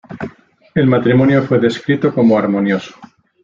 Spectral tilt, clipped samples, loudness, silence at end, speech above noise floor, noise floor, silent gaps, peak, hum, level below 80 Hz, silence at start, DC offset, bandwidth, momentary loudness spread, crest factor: -8 dB/octave; under 0.1%; -14 LUFS; 0.4 s; 25 dB; -38 dBFS; none; -2 dBFS; none; -52 dBFS; 0.1 s; under 0.1%; 7.6 kHz; 17 LU; 12 dB